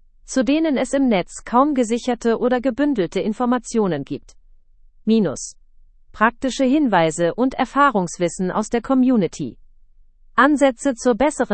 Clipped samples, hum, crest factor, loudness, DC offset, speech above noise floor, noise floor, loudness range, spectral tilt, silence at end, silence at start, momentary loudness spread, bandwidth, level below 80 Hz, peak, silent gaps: under 0.1%; none; 18 dB; -19 LUFS; under 0.1%; 30 dB; -49 dBFS; 4 LU; -5 dB/octave; 0 s; 0.25 s; 8 LU; 8.8 kHz; -46 dBFS; -2 dBFS; none